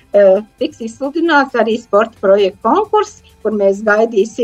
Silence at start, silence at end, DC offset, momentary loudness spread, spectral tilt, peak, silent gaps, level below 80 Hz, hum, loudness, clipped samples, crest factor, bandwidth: 0.15 s; 0 s; under 0.1%; 10 LU; -5 dB/octave; 0 dBFS; none; -54 dBFS; none; -14 LUFS; under 0.1%; 14 dB; 8.8 kHz